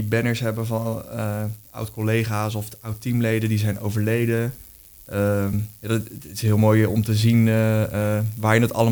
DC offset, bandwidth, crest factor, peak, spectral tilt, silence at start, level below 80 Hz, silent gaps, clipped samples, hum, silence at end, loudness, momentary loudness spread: under 0.1%; over 20 kHz; 16 dB; -6 dBFS; -6.5 dB/octave; 0 s; -50 dBFS; none; under 0.1%; none; 0 s; -22 LUFS; 13 LU